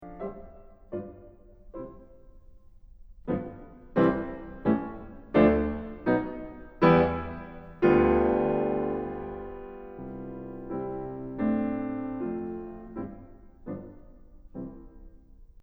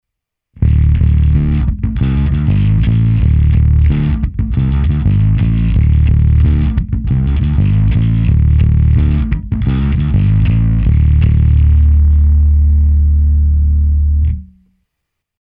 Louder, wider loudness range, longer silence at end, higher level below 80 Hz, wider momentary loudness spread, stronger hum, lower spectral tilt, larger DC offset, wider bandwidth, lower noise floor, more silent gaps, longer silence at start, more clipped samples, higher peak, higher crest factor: second, -28 LUFS vs -12 LUFS; first, 15 LU vs 2 LU; second, 0.2 s vs 0.95 s; second, -46 dBFS vs -12 dBFS; first, 22 LU vs 5 LU; neither; second, -10 dB/octave vs -12.5 dB/octave; neither; first, 5.6 kHz vs 3.7 kHz; second, -51 dBFS vs -78 dBFS; neither; second, 0 s vs 0.6 s; neither; second, -8 dBFS vs 0 dBFS; first, 22 dB vs 10 dB